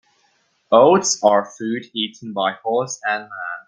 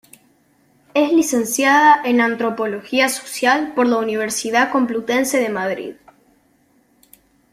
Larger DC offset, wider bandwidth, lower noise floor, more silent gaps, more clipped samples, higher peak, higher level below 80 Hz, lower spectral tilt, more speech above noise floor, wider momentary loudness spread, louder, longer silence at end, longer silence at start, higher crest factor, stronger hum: neither; second, 10 kHz vs 16 kHz; first, -63 dBFS vs -58 dBFS; neither; neither; about the same, 0 dBFS vs -2 dBFS; about the same, -66 dBFS vs -64 dBFS; about the same, -3 dB/octave vs -2.5 dB/octave; first, 45 dB vs 41 dB; about the same, 12 LU vs 10 LU; about the same, -18 LUFS vs -17 LUFS; second, 0.05 s vs 1.6 s; second, 0.7 s vs 0.95 s; about the same, 18 dB vs 16 dB; neither